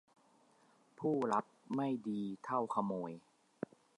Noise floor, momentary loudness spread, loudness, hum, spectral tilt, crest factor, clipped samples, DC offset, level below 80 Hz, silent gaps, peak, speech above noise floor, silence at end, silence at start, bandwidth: -70 dBFS; 14 LU; -39 LUFS; none; -7.5 dB/octave; 20 dB; under 0.1%; under 0.1%; -86 dBFS; none; -20 dBFS; 32 dB; 0.8 s; 1 s; 11 kHz